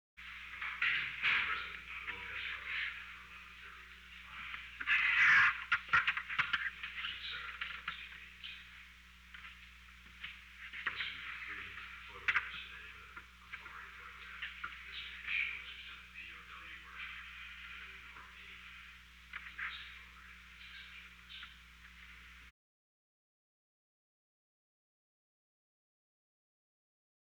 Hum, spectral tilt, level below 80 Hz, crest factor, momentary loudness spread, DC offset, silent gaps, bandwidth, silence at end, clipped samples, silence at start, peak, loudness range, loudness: none; -1.5 dB/octave; -64 dBFS; 22 dB; 22 LU; under 0.1%; none; over 20 kHz; 4.8 s; under 0.1%; 0.15 s; -20 dBFS; 17 LU; -36 LUFS